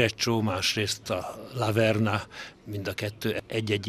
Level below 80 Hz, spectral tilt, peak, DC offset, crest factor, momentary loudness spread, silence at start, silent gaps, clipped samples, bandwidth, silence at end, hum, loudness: -60 dBFS; -4.5 dB/octave; -8 dBFS; under 0.1%; 20 dB; 12 LU; 0 s; none; under 0.1%; 14.5 kHz; 0 s; none; -28 LUFS